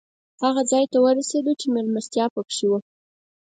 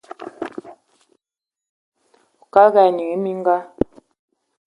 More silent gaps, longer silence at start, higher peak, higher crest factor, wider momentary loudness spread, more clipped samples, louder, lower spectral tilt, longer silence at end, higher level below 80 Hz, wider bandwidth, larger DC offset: second, 2.30-2.36 s vs 1.69-1.92 s; first, 0.4 s vs 0.2 s; second, -6 dBFS vs 0 dBFS; about the same, 16 dB vs 20 dB; second, 6 LU vs 19 LU; neither; second, -22 LUFS vs -17 LUFS; second, -4 dB/octave vs -7.5 dB/octave; second, 0.6 s vs 1 s; second, -74 dBFS vs -54 dBFS; about the same, 9.6 kHz vs 10.5 kHz; neither